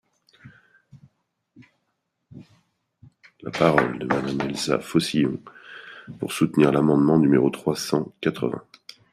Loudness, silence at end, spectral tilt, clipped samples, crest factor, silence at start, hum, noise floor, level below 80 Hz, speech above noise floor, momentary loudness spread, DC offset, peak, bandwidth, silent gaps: -22 LUFS; 0.5 s; -6 dB/octave; under 0.1%; 22 dB; 0.45 s; none; -76 dBFS; -58 dBFS; 54 dB; 20 LU; under 0.1%; -2 dBFS; 15 kHz; none